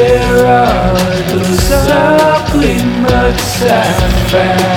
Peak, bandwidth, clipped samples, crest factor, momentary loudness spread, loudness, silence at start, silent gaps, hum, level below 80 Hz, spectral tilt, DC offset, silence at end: 0 dBFS; 19.5 kHz; under 0.1%; 10 dB; 4 LU; -10 LUFS; 0 s; none; none; -20 dBFS; -5 dB/octave; under 0.1%; 0 s